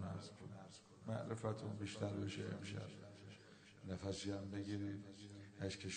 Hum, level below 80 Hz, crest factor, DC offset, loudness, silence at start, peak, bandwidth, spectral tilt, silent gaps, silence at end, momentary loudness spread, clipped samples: none; -74 dBFS; 20 dB; under 0.1%; -48 LUFS; 0 s; -28 dBFS; 9 kHz; -5.5 dB/octave; none; 0 s; 13 LU; under 0.1%